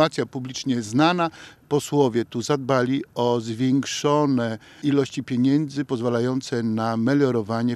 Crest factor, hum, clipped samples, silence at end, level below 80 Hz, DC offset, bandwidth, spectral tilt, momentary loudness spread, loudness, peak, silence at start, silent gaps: 18 dB; none; under 0.1%; 0 s; -66 dBFS; under 0.1%; 13.5 kHz; -6 dB/octave; 6 LU; -23 LUFS; -4 dBFS; 0 s; none